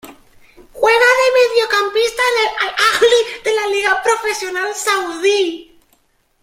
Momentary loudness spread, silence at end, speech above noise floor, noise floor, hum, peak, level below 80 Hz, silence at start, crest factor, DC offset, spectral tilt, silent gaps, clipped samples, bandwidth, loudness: 8 LU; 0.8 s; 43 dB; -59 dBFS; none; 0 dBFS; -54 dBFS; 0.05 s; 16 dB; under 0.1%; 0 dB/octave; none; under 0.1%; 16.5 kHz; -14 LUFS